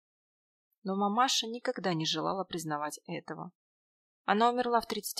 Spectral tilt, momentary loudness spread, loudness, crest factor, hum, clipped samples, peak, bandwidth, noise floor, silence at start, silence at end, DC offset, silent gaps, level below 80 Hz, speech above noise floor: -3.5 dB/octave; 14 LU; -31 LUFS; 22 dB; none; under 0.1%; -10 dBFS; 14.5 kHz; under -90 dBFS; 0.85 s; 0 s; under 0.1%; 3.55-4.25 s; -74 dBFS; over 58 dB